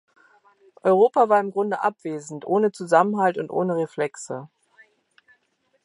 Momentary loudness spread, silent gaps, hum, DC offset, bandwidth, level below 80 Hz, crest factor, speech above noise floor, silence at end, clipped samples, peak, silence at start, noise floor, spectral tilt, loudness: 15 LU; none; none; under 0.1%; 11.5 kHz; -78 dBFS; 20 dB; 47 dB; 1.4 s; under 0.1%; -4 dBFS; 0.85 s; -68 dBFS; -6 dB/octave; -22 LUFS